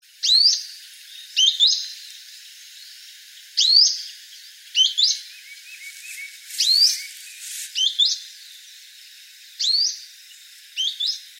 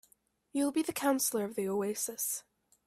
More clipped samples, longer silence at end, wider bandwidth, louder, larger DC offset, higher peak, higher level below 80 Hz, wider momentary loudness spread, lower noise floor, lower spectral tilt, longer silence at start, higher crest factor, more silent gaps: neither; second, 0.15 s vs 0.45 s; about the same, 16.5 kHz vs 16 kHz; first, -17 LUFS vs -33 LUFS; neither; first, -4 dBFS vs -18 dBFS; second, under -90 dBFS vs -76 dBFS; first, 25 LU vs 5 LU; second, -45 dBFS vs -70 dBFS; second, 14.5 dB/octave vs -3.5 dB/octave; second, 0.2 s vs 0.55 s; about the same, 20 dB vs 18 dB; neither